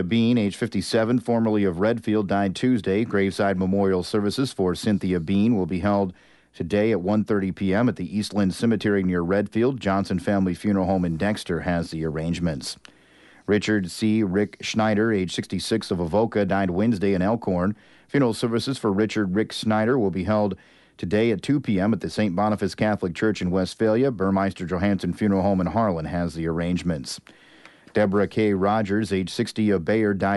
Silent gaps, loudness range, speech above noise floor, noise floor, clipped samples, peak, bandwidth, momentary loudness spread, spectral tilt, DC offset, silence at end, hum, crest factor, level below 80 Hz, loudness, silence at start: none; 2 LU; 31 dB; -53 dBFS; under 0.1%; -10 dBFS; 11.5 kHz; 5 LU; -6.5 dB/octave; under 0.1%; 0 s; none; 14 dB; -50 dBFS; -23 LUFS; 0 s